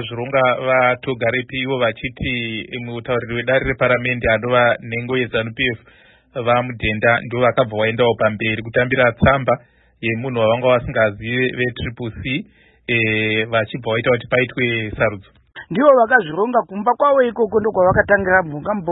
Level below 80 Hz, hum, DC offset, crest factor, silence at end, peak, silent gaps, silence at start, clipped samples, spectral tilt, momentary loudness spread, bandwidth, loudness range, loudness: -42 dBFS; none; under 0.1%; 18 dB; 0 s; 0 dBFS; none; 0 s; under 0.1%; -11 dB/octave; 9 LU; 4 kHz; 4 LU; -18 LUFS